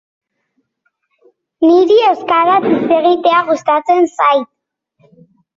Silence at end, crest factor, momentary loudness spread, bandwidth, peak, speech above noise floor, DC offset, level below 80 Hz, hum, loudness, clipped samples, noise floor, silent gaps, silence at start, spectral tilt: 1.15 s; 12 dB; 5 LU; 7.6 kHz; -2 dBFS; 56 dB; under 0.1%; -60 dBFS; none; -12 LUFS; under 0.1%; -66 dBFS; none; 1.6 s; -5.5 dB/octave